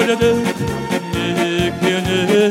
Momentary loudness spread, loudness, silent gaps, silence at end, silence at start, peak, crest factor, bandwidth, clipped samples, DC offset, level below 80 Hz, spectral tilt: 6 LU; -17 LUFS; none; 0 s; 0 s; -2 dBFS; 14 dB; 16.5 kHz; under 0.1%; under 0.1%; -40 dBFS; -5 dB/octave